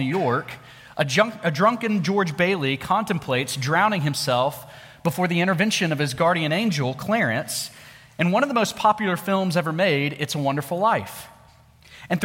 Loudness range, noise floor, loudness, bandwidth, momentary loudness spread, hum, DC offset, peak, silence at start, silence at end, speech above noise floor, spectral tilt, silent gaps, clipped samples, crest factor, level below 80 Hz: 1 LU; -52 dBFS; -22 LUFS; 17 kHz; 8 LU; none; under 0.1%; -4 dBFS; 0 s; 0 s; 30 dB; -5 dB/octave; none; under 0.1%; 18 dB; -60 dBFS